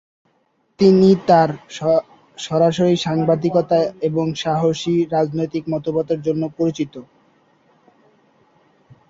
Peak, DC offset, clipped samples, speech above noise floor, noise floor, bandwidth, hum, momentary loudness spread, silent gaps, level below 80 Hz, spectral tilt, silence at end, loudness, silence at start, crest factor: -2 dBFS; under 0.1%; under 0.1%; 47 dB; -64 dBFS; 7.8 kHz; none; 10 LU; none; -58 dBFS; -7 dB/octave; 2.05 s; -18 LUFS; 0.8 s; 16 dB